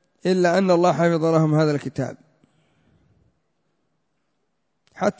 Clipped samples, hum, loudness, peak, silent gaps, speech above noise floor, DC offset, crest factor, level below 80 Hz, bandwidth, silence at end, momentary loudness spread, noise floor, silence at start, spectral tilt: under 0.1%; none; -20 LUFS; -6 dBFS; none; 56 dB; under 0.1%; 18 dB; -64 dBFS; 8 kHz; 0.1 s; 11 LU; -75 dBFS; 0.25 s; -7 dB/octave